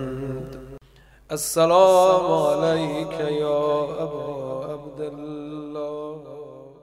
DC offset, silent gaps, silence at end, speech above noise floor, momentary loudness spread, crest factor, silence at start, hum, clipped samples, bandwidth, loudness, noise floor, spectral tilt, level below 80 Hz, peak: under 0.1%; none; 0.1 s; 32 dB; 20 LU; 20 dB; 0 s; none; under 0.1%; 16 kHz; -22 LUFS; -52 dBFS; -5 dB/octave; -54 dBFS; -4 dBFS